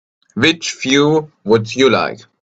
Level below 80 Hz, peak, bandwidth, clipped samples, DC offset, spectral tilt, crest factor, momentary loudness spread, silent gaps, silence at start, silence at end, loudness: -54 dBFS; 0 dBFS; 8.4 kHz; under 0.1%; under 0.1%; -4.5 dB/octave; 16 dB; 7 LU; none; 0.35 s; 0.3 s; -15 LUFS